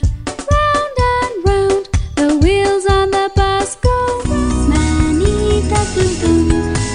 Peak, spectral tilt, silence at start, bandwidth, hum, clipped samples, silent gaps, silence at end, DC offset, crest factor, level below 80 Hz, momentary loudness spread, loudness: 0 dBFS; -5.5 dB/octave; 0 s; 10.5 kHz; none; under 0.1%; none; 0 s; under 0.1%; 14 dB; -20 dBFS; 4 LU; -15 LUFS